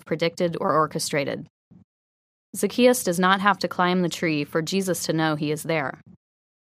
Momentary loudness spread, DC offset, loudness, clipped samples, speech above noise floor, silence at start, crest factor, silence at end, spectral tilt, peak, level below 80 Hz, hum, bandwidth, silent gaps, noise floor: 8 LU; under 0.1%; -23 LUFS; under 0.1%; over 67 dB; 0.05 s; 22 dB; 0.75 s; -4.5 dB/octave; -2 dBFS; -68 dBFS; none; 15.5 kHz; 1.50-1.71 s, 1.84-2.53 s; under -90 dBFS